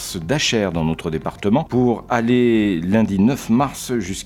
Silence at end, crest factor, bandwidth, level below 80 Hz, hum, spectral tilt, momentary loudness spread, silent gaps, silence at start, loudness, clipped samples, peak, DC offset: 0 s; 18 dB; 16.5 kHz; -42 dBFS; none; -5.5 dB/octave; 7 LU; none; 0 s; -19 LUFS; under 0.1%; -2 dBFS; under 0.1%